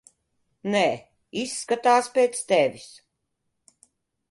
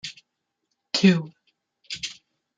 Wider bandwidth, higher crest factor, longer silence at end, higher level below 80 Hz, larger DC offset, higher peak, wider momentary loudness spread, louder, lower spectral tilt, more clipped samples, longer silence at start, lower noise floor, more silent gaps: first, 11.5 kHz vs 7.8 kHz; about the same, 18 dB vs 22 dB; first, 1.45 s vs 0.45 s; about the same, -72 dBFS vs -68 dBFS; neither; second, -8 dBFS vs -4 dBFS; second, 15 LU vs 19 LU; about the same, -23 LUFS vs -23 LUFS; second, -3.5 dB/octave vs -5 dB/octave; neither; first, 0.65 s vs 0.05 s; about the same, -78 dBFS vs -79 dBFS; neither